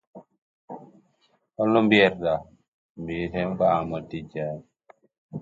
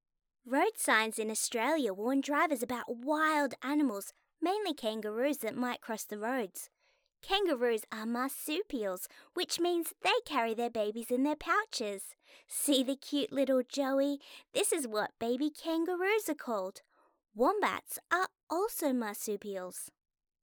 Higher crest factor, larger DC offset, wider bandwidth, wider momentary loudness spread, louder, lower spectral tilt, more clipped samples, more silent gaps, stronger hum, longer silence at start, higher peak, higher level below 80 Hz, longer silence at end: about the same, 22 dB vs 18 dB; neither; second, 7.6 kHz vs over 20 kHz; first, 25 LU vs 10 LU; first, -24 LUFS vs -33 LUFS; first, -7.5 dB/octave vs -2 dB/octave; neither; first, 0.38-0.68 s, 2.68-2.95 s, 5.18-5.29 s vs 18.43-18.47 s; neither; second, 0.15 s vs 0.45 s; first, -6 dBFS vs -14 dBFS; first, -56 dBFS vs -70 dBFS; second, 0 s vs 0.55 s